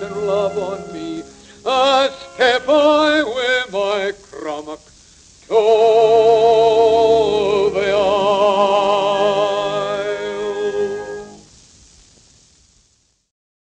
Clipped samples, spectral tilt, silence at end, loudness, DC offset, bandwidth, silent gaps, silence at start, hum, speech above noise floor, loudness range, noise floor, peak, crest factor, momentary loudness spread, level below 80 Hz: under 0.1%; -4 dB/octave; 2.25 s; -16 LUFS; under 0.1%; 9.2 kHz; none; 0 s; none; 45 dB; 11 LU; -60 dBFS; -2 dBFS; 14 dB; 16 LU; -52 dBFS